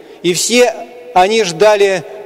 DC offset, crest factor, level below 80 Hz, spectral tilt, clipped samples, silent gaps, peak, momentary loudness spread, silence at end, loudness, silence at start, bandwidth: under 0.1%; 12 dB; -50 dBFS; -2.5 dB/octave; under 0.1%; none; -2 dBFS; 6 LU; 0 s; -12 LUFS; 0.1 s; 16 kHz